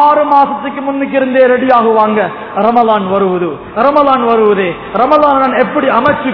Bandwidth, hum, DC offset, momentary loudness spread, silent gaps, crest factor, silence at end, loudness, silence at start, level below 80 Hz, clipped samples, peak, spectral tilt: 5.4 kHz; none; 0.2%; 8 LU; none; 10 dB; 0 s; -10 LUFS; 0 s; -46 dBFS; 0.7%; 0 dBFS; -8.5 dB/octave